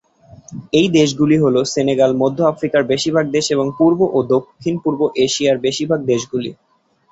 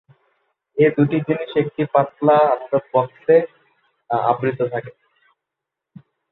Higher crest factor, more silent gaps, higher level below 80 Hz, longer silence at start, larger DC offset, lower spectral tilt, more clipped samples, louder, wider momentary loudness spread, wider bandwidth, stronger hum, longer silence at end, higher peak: about the same, 14 dB vs 18 dB; neither; first, -54 dBFS vs -66 dBFS; second, 0.3 s vs 0.75 s; neither; second, -5 dB/octave vs -11 dB/octave; neither; first, -16 LUFS vs -19 LUFS; about the same, 7 LU vs 9 LU; first, 8.2 kHz vs 4.2 kHz; neither; second, 0.6 s vs 1.4 s; about the same, -2 dBFS vs -2 dBFS